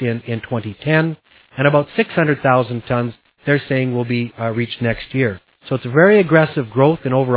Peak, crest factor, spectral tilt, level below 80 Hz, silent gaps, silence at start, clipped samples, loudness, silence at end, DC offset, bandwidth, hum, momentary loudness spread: 0 dBFS; 16 dB; -11 dB/octave; -50 dBFS; none; 0 s; under 0.1%; -17 LUFS; 0 s; under 0.1%; 4 kHz; none; 12 LU